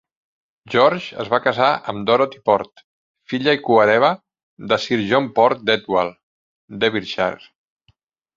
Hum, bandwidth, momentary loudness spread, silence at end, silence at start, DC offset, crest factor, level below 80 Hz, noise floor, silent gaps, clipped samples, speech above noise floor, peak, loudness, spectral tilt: none; 7.6 kHz; 12 LU; 1 s; 0.7 s; under 0.1%; 18 dB; -60 dBFS; -63 dBFS; 2.84-3.14 s, 4.43-4.57 s, 6.23-6.68 s; under 0.1%; 45 dB; -2 dBFS; -18 LUFS; -5.5 dB/octave